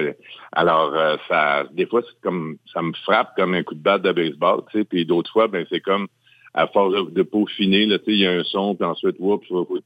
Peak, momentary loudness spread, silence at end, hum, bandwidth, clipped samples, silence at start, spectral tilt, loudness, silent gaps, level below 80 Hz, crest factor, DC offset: -2 dBFS; 9 LU; 0.05 s; none; 15.5 kHz; under 0.1%; 0 s; -7.5 dB/octave; -20 LUFS; none; -66 dBFS; 18 dB; under 0.1%